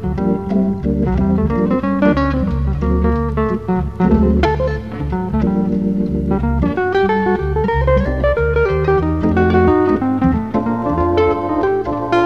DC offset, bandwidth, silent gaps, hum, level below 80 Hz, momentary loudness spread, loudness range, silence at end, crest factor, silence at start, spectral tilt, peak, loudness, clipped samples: 0.9%; 6.6 kHz; none; none; -24 dBFS; 5 LU; 2 LU; 0 s; 16 dB; 0 s; -9.5 dB/octave; 0 dBFS; -16 LUFS; under 0.1%